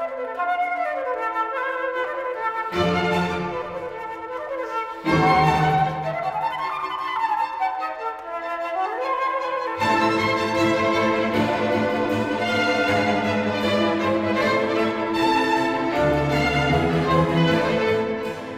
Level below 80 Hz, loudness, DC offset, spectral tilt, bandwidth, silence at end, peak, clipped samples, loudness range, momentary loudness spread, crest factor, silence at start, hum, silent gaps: -46 dBFS; -22 LUFS; under 0.1%; -6 dB/octave; 16 kHz; 0 s; -6 dBFS; under 0.1%; 5 LU; 8 LU; 18 dB; 0 s; none; none